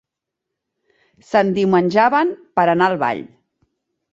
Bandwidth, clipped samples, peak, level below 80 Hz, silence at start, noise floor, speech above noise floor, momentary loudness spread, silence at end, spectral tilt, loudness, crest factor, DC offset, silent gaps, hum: 7.8 kHz; under 0.1%; -2 dBFS; -62 dBFS; 1.3 s; -82 dBFS; 65 dB; 6 LU; 0.85 s; -7 dB/octave; -17 LUFS; 18 dB; under 0.1%; none; none